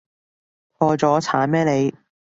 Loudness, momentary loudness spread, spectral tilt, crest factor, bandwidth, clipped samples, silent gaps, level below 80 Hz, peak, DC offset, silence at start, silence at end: -19 LUFS; 4 LU; -6.5 dB/octave; 18 dB; 8 kHz; under 0.1%; none; -60 dBFS; -2 dBFS; under 0.1%; 0.8 s; 0.45 s